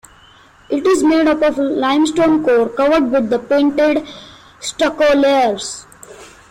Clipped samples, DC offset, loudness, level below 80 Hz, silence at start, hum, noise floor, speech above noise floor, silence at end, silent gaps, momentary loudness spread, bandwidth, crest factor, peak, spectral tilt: under 0.1%; under 0.1%; -14 LUFS; -48 dBFS; 0.7 s; none; -46 dBFS; 32 dB; 0.25 s; none; 13 LU; 13.5 kHz; 10 dB; -4 dBFS; -4 dB/octave